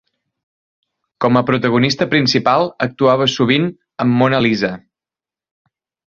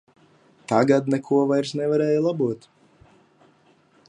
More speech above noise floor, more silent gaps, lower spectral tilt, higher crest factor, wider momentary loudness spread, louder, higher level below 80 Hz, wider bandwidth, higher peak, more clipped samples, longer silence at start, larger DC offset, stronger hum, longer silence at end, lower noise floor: first, 75 dB vs 38 dB; neither; about the same, -6 dB/octave vs -7 dB/octave; about the same, 16 dB vs 20 dB; about the same, 7 LU vs 8 LU; first, -15 LUFS vs -22 LUFS; first, -54 dBFS vs -70 dBFS; second, 7.4 kHz vs 10.5 kHz; about the same, -2 dBFS vs -4 dBFS; neither; first, 1.2 s vs 0.7 s; neither; neither; second, 1.3 s vs 1.5 s; first, -90 dBFS vs -59 dBFS